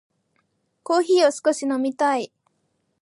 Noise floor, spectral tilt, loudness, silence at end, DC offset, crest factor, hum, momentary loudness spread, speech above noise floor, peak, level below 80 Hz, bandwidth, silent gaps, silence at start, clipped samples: -71 dBFS; -2.5 dB/octave; -21 LUFS; 0.75 s; under 0.1%; 16 dB; none; 12 LU; 51 dB; -6 dBFS; -82 dBFS; 11.5 kHz; none; 0.9 s; under 0.1%